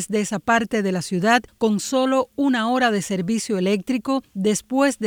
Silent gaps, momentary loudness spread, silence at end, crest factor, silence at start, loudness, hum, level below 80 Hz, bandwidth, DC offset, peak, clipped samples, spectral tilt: none; 4 LU; 0 s; 16 dB; 0 s; -21 LUFS; none; -58 dBFS; 19.5 kHz; under 0.1%; -4 dBFS; under 0.1%; -4.5 dB/octave